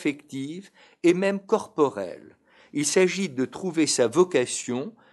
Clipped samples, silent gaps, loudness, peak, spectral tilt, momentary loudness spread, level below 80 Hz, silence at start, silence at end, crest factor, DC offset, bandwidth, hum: under 0.1%; none; -25 LUFS; -6 dBFS; -4 dB/octave; 13 LU; -74 dBFS; 0 s; 0.2 s; 20 dB; under 0.1%; 12 kHz; none